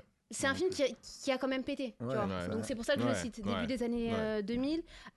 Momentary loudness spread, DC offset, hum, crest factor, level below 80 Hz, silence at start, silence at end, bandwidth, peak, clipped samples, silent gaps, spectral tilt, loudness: 5 LU; under 0.1%; none; 16 dB; -58 dBFS; 0.3 s; 0.05 s; 12 kHz; -20 dBFS; under 0.1%; none; -4.5 dB/octave; -35 LUFS